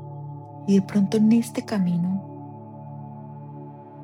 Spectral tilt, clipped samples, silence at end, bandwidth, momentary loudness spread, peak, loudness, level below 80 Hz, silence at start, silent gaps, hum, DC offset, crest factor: -7.5 dB/octave; under 0.1%; 0 s; 13.5 kHz; 20 LU; -8 dBFS; -22 LUFS; -68 dBFS; 0 s; none; none; under 0.1%; 16 dB